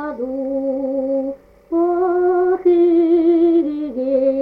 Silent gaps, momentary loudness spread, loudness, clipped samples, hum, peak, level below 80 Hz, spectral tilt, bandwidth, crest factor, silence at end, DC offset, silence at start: none; 10 LU; -17 LUFS; under 0.1%; none; -6 dBFS; -54 dBFS; -8.5 dB/octave; 4.2 kHz; 12 dB; 0 s; under 0.1%; 0 s